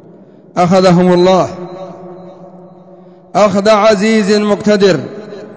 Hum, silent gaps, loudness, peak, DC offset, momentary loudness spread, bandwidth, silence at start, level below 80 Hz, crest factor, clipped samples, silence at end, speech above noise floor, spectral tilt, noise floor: none; none; -10 LUFS; 0 dBFS; 0.3%; 20 LU; 8 kHz; 0.55 s; -48 dBFS; 12 dB; under 0.1%; 0 s; 30 dB; -6 dB/octave; -39 dBFS